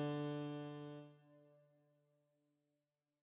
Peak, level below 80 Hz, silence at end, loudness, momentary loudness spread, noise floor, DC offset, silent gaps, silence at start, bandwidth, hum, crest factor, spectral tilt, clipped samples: -34 dBFS; under -90 dBFS; 1.65 s; -47 LUFS; 23 LU; under -90 dBFS; under 0.1%; none; 0 s; 4 kHz; none; 16 dB; -6.5 dB/octave; under 0.1%